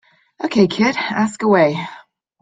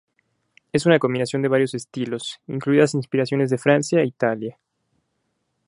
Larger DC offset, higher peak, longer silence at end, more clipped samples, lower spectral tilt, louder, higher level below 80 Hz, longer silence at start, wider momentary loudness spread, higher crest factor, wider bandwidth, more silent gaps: neither; about the same, -2 dBFS vs -2 dBFS; second, 0.4 s vs 1.15 s; neither; about the same, -6 dB/octave vs -6 dB/octave; first, -17 LUFS vs -21 LUFS; first, -60 dBFS vs -66 dBFS; second, 0.4 s vs 0.75 s; first, 13 LU vs 10 LU; about the same, 16 dB vs 20 dB; second, 9.2 kHz vs 11.5 kHz; neither